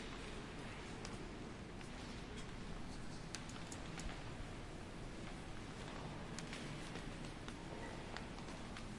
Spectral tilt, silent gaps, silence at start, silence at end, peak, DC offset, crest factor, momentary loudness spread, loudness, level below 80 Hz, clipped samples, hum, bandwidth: -4.5 dB/octave; none; 0 s; 0 s; -26 dBFS; under 0.1%; 22 dB; 3 LU; -50 LUFS; -56 dBFS; under 0.1%; none; 11.5 kHz